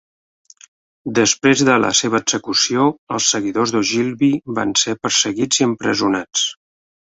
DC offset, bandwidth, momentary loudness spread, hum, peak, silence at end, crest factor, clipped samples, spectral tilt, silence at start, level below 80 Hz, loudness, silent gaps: under 0.1%; 8.2 kHz; 5 LU; none; -2 dBFS; 0.6 s; 16 dB; under 0.1%; -2.5 dB/octave; 1.05 s; -58 dBFS; -16 LUFS; 2.98-3.07 s